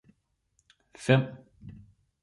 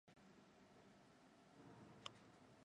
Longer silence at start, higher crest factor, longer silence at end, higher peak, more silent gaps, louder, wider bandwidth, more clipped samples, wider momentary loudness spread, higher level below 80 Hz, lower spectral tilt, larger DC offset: first, 1 s vs 0.05 s; second, 24 dB vs 32 dB; first, 0.5 s vs 0 s; first, -8 dBFS vs -32 dBFS; neither; first, -27 LUFS vs -64 LUFS; about the same, 11.5 kHz vs 10.5 kHz; neither; first, 24 LU vs 11 LU; first, -64 dBFS vs -88 dBFS; first, -6.5 dB/octave vs -4 dB/octave; neither